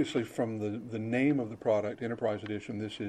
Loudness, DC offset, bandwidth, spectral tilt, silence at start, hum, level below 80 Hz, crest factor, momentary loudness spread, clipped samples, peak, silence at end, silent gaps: -33 LUFS; under 0.1%; 13 kHz; -7 dB/octave; 0 s; none; -70 dBFS; 16 dB; 8 LU; under 0.1%; -16 dBFS; 0 s; none